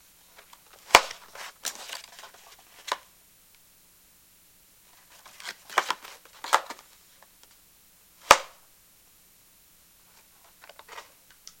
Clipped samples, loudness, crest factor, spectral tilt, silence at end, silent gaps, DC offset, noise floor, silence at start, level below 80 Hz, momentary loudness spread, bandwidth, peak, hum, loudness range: under 0.1%; -26 LUFS; 32 dB; 0 dB/octave; 0.6 s; none; under 0.1%; -58 dBFS; 0.9 s; -64 dBFS; 30 LU; 17 kHz; 0 dBFS; none; 14 LU